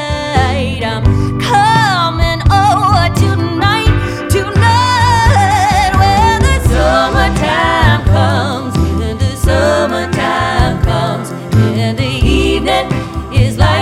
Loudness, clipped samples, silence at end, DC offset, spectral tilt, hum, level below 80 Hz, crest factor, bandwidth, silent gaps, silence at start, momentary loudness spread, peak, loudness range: -12 LUFS; under 0.1%; 0 s; under 0.1%; -5.5 dB/octave; none; -20 dBFS; 10 dB; 14 kHz; none; 0 s; 6 LU; 0 dBFS; 3 LU